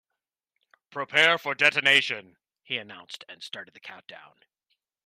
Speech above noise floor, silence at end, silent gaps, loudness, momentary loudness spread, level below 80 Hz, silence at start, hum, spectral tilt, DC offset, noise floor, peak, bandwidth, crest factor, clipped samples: 60 dB; 0.85 s; none; -22 LUFS; 23 LU; -78 dBFS; 0.95 s; none; -2 dB/octave; under 0.1%; -87 dBFS; -4 dBFS; 15 kHz; 24 dB; under 0.1%